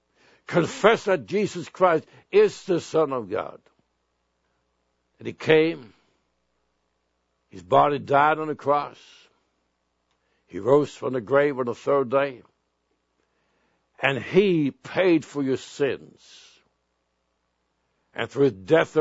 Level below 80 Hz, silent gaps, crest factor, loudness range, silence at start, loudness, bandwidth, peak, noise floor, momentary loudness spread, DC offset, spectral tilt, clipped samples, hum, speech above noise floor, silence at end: -68 dBFS; none; 24 dB; 5 LU; 0.5 s; -23 LUFS; 8 kHz; -2 dBFS; -74 dBFS; 11 LU; under 0.1%; -6 dB/octave; under 0.1%; none; 51 dB; 0 s